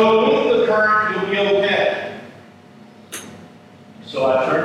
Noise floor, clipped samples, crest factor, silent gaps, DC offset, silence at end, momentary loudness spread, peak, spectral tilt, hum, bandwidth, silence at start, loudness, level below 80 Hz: -44 dBFS; under 0.1%; 16 dB; none; under 0.1%; 0 s; 18 LU; -4 dBFS; -4.5 dB/octave; none; 13.5 kHz; 0 s; -17 LUFS; -66 dBFS